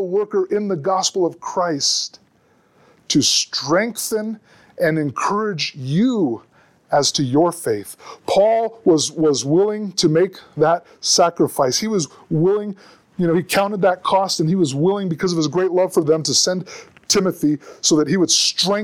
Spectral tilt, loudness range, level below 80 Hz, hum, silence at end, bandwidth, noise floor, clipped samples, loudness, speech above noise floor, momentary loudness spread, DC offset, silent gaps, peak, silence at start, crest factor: -4 dB/octave; 3 LU; -60 dBFS; none; 0 s; 17.5 kHz; -58 dBFS; under 0.1%; -18 LUFS; 39 dB; 8 LU; under 0.1%; none; -4 dBFS; 0 s; 14 dB